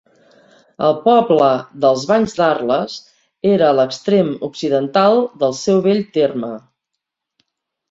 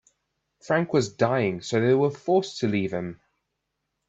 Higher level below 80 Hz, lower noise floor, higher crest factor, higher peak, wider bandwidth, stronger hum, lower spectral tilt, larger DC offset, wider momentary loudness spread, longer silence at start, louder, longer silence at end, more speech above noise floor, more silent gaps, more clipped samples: first, -60 dBFS vs -66 dBFS; about the same, -79 dBFS vs -80 dBFS; about the same, 16 dB vs 18 dB; first, -2 dBFS vs -8 dBFS; about the same, 7.8 kHz vs 8 kHz; neither; about the same, -6 dB/octave vs -6 dB/octave; neither; about the same, 8 LU vs 6 LU; first, 0.8 s vs 0.65 s; first, -16 LUFS vs -24 LUFS; first, 1.3 s vs 0.95 s; first, 64 dB vs 56 dB; neither; neither